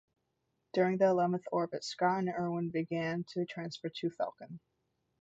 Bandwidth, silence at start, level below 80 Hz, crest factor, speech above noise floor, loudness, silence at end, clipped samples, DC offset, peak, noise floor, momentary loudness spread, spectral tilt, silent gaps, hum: 8 kHz; 0.75 s; -78 dBFS; 18 dB; 48 dB; -34 LUFS; 0.6 s; under 0.1%; under 0.1%; -16 dBFS; -82 dBFS; 12 LU; -6.5 dB/octave; none; none